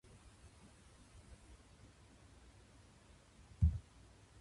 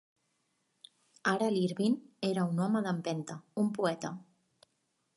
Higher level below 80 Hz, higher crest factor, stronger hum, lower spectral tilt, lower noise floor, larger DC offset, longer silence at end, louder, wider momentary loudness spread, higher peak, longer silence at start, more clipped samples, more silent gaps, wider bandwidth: first, -48 dBFS vs -80 dBFS; first, 26 dB vs 18 dB; neither; about the same, -7 dB/octave vs -6 dB/octave; second, -64 dBFS vs -79 dBFS; neither; second, 0.6 s vs 0.95 s; second, -39 LUFS vs -33 LUFS; first, 26 LU vs 10 LU; second, -20 dBFS vs -16 dBFS; first, 3.6 s vs 1.25 s; neither; neither; about the same, 11.5 kHz vs 11.5 kHz